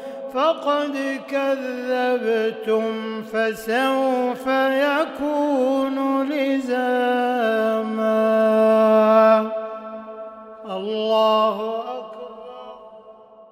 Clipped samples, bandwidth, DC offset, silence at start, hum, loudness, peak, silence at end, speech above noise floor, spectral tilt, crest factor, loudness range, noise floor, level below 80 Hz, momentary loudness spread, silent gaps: under 0.1%; 15.5 kHz; under 0.1%; 0 s; none; -20 LUFS; -4 dBFS; 0.1 s; 26 dB; -5.5 dB/octave; 16 dB; 6 LU; -45 dBFS; -66 dBFS; 18 LU; none